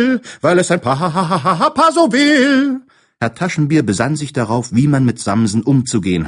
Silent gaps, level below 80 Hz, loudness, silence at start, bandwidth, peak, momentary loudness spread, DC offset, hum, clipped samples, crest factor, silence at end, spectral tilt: none; -48 dBFS; -14 LUFS; 0 s; 11 kHz; 0 dBFS; 7 LU; under 0.1%; none; under 0.1%; 14 dB; 0 s; -5.5 dB/octave